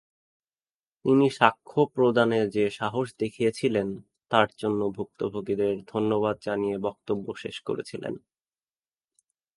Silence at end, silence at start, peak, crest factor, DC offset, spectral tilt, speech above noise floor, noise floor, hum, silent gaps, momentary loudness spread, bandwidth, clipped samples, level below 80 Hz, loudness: 1.4 s; 1.05 s; -2 dBFS; 26 dB; under 0.1%; -6.5 dB/octave; over 64 dB; under -90 dBFS; none; none; 12 LU; 11.5 kHz; under 0.1%; -64 dBFS; -26 LUFS